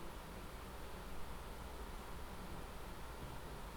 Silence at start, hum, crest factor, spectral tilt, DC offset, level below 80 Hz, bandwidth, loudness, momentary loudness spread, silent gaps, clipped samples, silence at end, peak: 0 s; none; 14 dB; -4.5 dB/octave; under 0.1%; -52 dBFS; over 20 kHz; -51 LUFS; 1 LU; none; under 0.1%; 0 s; -34 dBFS